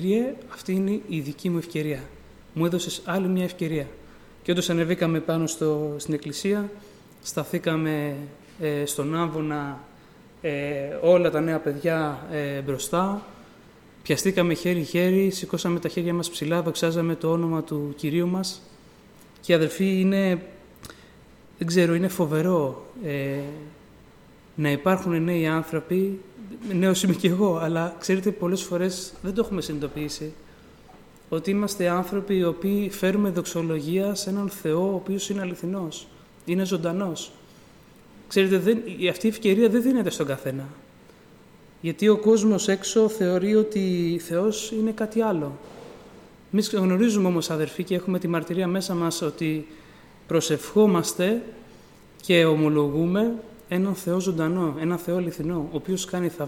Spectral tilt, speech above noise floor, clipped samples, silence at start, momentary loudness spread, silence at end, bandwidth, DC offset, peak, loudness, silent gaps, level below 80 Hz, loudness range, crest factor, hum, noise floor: -5.5 dB/octave; 27 dB; under 0.1%; 0 s; 12 LU; 0 s; 17 kHz; under 0.1%; -6 dBFS; -25 LUFS; none; -56 dBFS; 5 LU; 18 dB; none; -51 dBFS